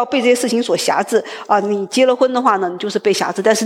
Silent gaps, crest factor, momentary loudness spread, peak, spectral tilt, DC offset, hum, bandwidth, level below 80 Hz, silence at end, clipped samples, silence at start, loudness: none; 14 dB; 5 LU; -2 dBFS; -3.5 dB/octave; under 0.1%; none; 16.5 kHz; -72 dBFS; 0 s; under 0.1%; 0 s; -16 LUFS